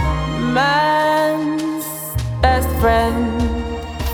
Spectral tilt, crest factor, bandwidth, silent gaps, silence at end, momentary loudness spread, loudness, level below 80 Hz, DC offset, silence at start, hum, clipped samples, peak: -5.5 dB/octave; 16 dB; over 20 kHz; none; 0 s; 9 LU; -18 LUFS; -26 dBFS; under 0.1%; 0 s; none; under 0.1%; -2 dBFS